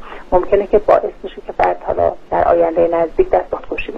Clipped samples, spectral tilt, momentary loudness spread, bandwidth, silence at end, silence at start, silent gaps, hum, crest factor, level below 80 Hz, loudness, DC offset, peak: under 0.1%; -8 dB/octave; 10 LU; 6.2 kHz; 0 s; 0 s; none; none; 14 dB; -34 dBFS; -16 LUFS; under 0.1%; 0 dBFS